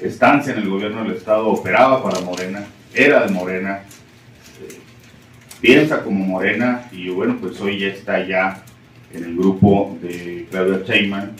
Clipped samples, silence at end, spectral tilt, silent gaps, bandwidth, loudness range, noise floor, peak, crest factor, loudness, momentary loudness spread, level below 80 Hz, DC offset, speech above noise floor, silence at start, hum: under 0.1%; 0 s; -6 dB/octave; none; 16 kHz; 3 LU; -44 dBFS; 0 dBFS; 18 dB; -17 LUFS; 15 LU; -54 dBFS; under 0.1%; 27 dB; 0 s; none